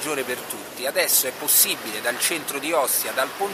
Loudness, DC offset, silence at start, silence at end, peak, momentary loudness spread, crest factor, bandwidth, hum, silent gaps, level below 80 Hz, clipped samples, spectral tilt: -21 LUFS; under 0.1%; 0 s; 0 s; -2 dBFS; 11 LU; 20 dB; 15.5 kHz; none; none; -68 dBFS; under 0.1%; 0 dB/octave